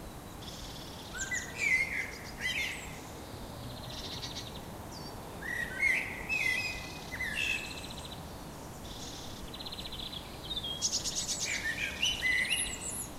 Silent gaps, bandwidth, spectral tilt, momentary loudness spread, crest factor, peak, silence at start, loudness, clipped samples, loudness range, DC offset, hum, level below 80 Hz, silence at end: none; 16 kHz; -1.5 dB/octave; 16 LU; 18 dB; -18 dBFS; 0 s; -34 LUFS; under 0.1%; 7 LU; under 0.1%; none; -52 dBFS; 0 s